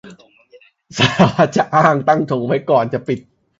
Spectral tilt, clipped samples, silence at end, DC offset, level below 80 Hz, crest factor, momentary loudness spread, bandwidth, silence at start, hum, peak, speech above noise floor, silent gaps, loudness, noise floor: -6 dB/octave; under 0.1%; 0.4 s; under 0.1%; -50 dBFS; 16 dB; 10 LU; 8 kHz; 0.05 s; none; 0 dBFS; 34 dB; none; -15 LUFS; -49 dBFS